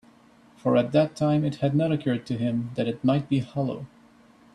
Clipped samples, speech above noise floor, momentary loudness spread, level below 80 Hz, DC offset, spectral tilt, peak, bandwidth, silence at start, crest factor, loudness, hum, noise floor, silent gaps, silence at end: under 0.1%; 31 dB; 8 LU; -62 dBFS; under 0.1%; -8 dB/octave; -8 dBFS; 10.5 kHz; 0.65 s; 16 dB; -25 LUFS; none; -55 dBFS; none; 0.7 s